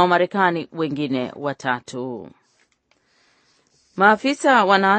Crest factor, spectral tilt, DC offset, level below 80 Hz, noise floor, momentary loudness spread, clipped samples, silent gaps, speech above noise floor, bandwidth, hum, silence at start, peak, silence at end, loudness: 20 dB; -5 dB/octave; under 0.1%; -70 dBFS; -64 dBFS; 15 LU; under 0.1%; none; 45 dB; 8.8 kHz; none; 0 s; 0 dBFS; 0 s; -19 LUFS